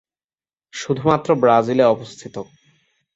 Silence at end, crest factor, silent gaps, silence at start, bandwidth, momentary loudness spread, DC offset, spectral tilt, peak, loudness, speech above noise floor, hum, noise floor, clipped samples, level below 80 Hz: 0.75 s; 18 dB; none; 0.75 s; 8 kHz; 19 LU; under 0.1%; -6 dB/octave; -2 dBFS; -17 LUFS; over 73 dB; none; under -90 dBFS; under 0.1%; -58 dBFS